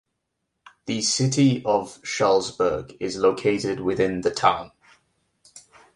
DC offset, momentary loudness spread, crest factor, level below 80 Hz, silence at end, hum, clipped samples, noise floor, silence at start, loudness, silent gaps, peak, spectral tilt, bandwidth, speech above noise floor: under 0.1%; 11 LU; 20 dB; -56 dBFS; 0.35 s; none; under 0.1%; -78 dBFS; 0.85 s; -23 LUFS; none; -4 dBFS; -4.5 dB/octave; 11.5 kHz; 56 dB